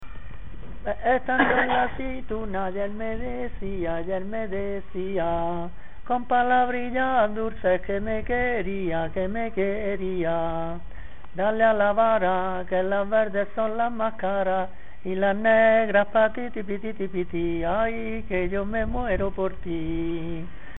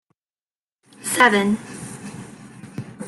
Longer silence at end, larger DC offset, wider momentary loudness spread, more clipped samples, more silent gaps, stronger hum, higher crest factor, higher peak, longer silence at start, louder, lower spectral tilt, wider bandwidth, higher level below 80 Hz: about the same, 0 s vs 0 s; first, 3% vs under 0.1%; second, 12 LU vs 24 LU; neither; neither; neither; about the same, 20 dB vs 22 dB; second, -6 dBFS vs -2 dBFS; second, 0 s vs 1 s; second, -25 LUFS vs -18 LUFS; first, -10 dB/octave vs -3.5 dB/octave; second, 4 kHz vs 14.5 kHz; first, -40 dBFS vs -64 dBFS